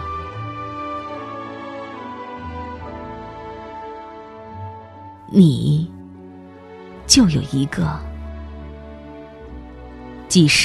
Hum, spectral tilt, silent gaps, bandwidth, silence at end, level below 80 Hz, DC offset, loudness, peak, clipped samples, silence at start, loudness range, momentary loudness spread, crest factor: none; -4.5 dB/octave; none; 13 kHz; 0 s; -42 dBFS; under 0.1%; -20 LUFS; 0 dBFS; under 0.1%; 0 s; 14 LU; 24 LU; 22 dB